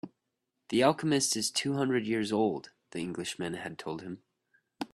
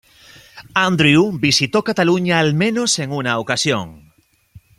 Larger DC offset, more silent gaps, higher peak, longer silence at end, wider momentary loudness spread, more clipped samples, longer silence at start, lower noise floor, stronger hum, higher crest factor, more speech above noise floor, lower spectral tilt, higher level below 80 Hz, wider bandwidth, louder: neither; neither; second, -10 dBFS vs 0 dBFS; about the same, 0.1 s vs 0.2 s; first, 16 LU vs 7 LU; neither; second, 0.05 s vs 0.55 s; first, -83 dBFS vs -56 dBFS; neither; about the same, 22 dB vs 18 dB; first, 53 dB vs 40 dB; about the same, -4 dB/octave vs -4 dB/octave; second, -70 dBFS vs -54 dBFS; second, 13.5 kHz vs 15 kHz; second, -31 LUFS vs -16 LUFS